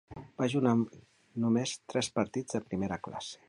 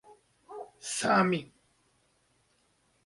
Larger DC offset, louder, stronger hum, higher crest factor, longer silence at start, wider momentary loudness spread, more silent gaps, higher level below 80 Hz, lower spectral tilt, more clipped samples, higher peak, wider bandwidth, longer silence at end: neither; second, -32 LUFS vs -29 LUFS; neither; about the same, 20 dB vs 22 dB; about the same, 0.1 s vs 0.1 s; second, 10 LU vs 21 LU; neither; first, -62 dBFS vs -74 dBFS; first, -5.5 dB/octave vs -4 dB/octave; neither; about the same, -14 dBFS vs -12 dBFS; about the same, 11.5 kHz vs 11.5 kHz; second, 0.15 s vs 1.6 s